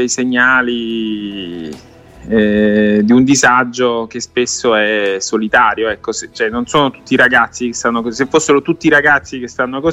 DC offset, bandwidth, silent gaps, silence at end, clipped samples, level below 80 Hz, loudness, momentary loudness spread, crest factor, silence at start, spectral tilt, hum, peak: under 0.1%; 11 kHz; none; 0 s; under 0.1%; -46 dBFS; -13 LUFS; 11 LU; 14 dB; 0 s; -3.5 dB/octave; none; 0 dBFS